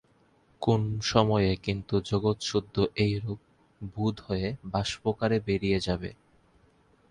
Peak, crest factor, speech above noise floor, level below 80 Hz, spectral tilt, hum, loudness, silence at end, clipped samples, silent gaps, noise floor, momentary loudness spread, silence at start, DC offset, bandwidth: -6 dBFS; 24 dB; 36 dB; -48 dBFS; -6 dB/octave; none; -28 LUFS; 1 s; under 0.1%; none; -64 dBFS; 9 LU; 0.6 s; under 0.1%; 10.5 kHz